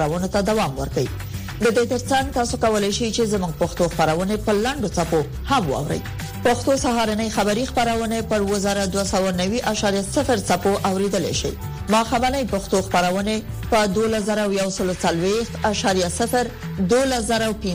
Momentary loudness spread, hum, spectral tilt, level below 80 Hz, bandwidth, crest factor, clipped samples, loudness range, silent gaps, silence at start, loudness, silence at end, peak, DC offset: 5 LU; none; -4.5 dB/octave; -36 dBFS; 15.5 kHz; 16 dB; under 0.1%; 1 LU; none; 0 s; -21 LUFS; 0 s; -6 dBFS; 0.1%